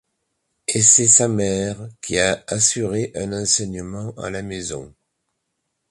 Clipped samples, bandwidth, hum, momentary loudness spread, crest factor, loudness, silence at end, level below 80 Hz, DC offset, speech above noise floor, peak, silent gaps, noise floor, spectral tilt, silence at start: under 0.1%; 11.5 kHz; none; 18 LU; 22 dB; -17 LUFS; 1 s; -48 dBFS; under 0.1%; 55 dB; 0 dBFS; none; -75 dBFS; -2.5 dB/octave; 0.7 s